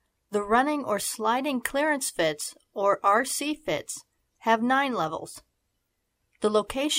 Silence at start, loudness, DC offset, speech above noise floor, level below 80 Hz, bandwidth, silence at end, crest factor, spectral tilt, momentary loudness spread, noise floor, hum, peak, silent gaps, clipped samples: 0.3 s; -26 LUFS; under 0.1%; 51 dB; -60 dBFS; 16 kHz; 0 s; 20 dB; -2.5 dB/octave; 12 LU; -77 dBFS; none; -8 dBFS; none; under 0.1%